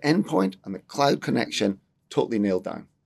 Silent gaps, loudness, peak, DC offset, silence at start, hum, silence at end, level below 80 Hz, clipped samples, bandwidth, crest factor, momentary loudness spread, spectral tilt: none; -25 LUFS; -8 dBFS; under 0.1%; 0 s; none; 0.2 s; -70 dBFS; under 0.1%; 13 kHz; 18 dB; 12 LU; -5.5 dB/octave